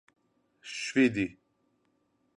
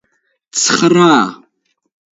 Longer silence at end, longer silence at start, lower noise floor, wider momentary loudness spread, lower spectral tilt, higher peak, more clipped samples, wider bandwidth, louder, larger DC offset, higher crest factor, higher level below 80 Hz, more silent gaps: first, 1.05 s vs 0.85 s; about the same, 0.65 s vs 0.55 s; first, -73 dBFS vs -64 dBFS; first, 16 LU vs 12 LU; about the same, -4.5 dB/octave vs -3.5 dB/octave; second, -12 dBFS vs 0 dBFS; neither; first, 10.5 kHz vs 8 kHz; second, -29 LUFS vs -12 LUFS; neither; first, 22 dB vs 14 dB; second, -66 dBFS vs -60 dBFS; neither